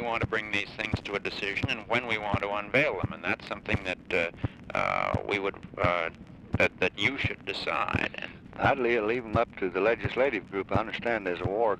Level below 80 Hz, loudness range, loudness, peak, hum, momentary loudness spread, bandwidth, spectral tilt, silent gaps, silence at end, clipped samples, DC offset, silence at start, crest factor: -50 dBFS; 1 LU; -29 LUFS; -12 dBFS; none; 7 LU; 12 kHz; -6 dB/octave; none; 0 s; under 0.1%; under 0.1%; 0 s; 18 dB